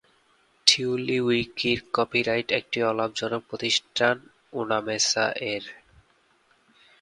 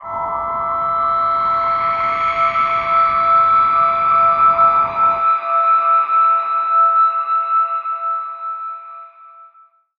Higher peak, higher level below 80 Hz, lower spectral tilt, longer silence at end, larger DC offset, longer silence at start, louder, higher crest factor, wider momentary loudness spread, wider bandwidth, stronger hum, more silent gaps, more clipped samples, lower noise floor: about the same, -2 dBFS vs -4 dBFS; second, -62 dBFS vs -50 dBFS; second, -2.5 dB/octave vs -5.5 dB/octave; first, 1.3 s vs 0.55 s; neither; first, 0.65 s vs 0 s; second, -24 LUFS vs -15 LUFS; first, 26 dB vs 12 dB; about the same, 10 LU vs 10 LU; first, 11.5 kHz vs 5 kHz; neither; neither; neither; first, -64 dBFS vs -50 dBFS